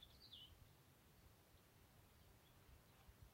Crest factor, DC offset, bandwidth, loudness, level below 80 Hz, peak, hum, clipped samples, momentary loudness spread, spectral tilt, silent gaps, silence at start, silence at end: 18 dB; under 0.1%; 16 kHz; -65 LUFS; -74 dBFS; -50 dBFS; none; under 0.1%; 9 LU; -3.5 dB/octave; none; 0 s; 0 s